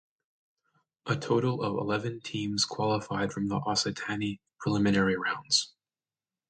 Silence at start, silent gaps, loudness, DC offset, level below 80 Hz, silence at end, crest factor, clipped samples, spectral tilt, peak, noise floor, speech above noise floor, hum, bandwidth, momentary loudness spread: 1.05 s; none; -29 LUFS; under 0.1%; -62 dBFS; 0.85 s; 20 dB; under 0.1%; -4.5 dB/octave; -10 dBFS; under -90 dBFS; over 61 dB; none; 9.4 kHz; 9 LU